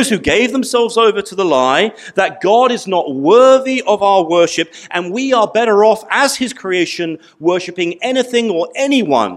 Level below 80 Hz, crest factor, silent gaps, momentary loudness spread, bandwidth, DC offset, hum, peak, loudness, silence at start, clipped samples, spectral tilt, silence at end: -52 dBFS; 14 dB; none; 8 LU; 14 kHz; under 0.1%; none; 0 dBFS; -13 LUFS; 0 s; under 0.1%; -3.5 dB/octave; 0 s